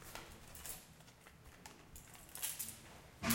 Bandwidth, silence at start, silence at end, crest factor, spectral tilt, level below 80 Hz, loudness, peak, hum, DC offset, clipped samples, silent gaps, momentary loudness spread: 17 kHz; 0 s; 0 s; 28 dB; -2.5 dB/octave; -64 dBFS; -48 LUFS; -20 dBFS; none; under 0.1%; under 0.1%; none; 18 LU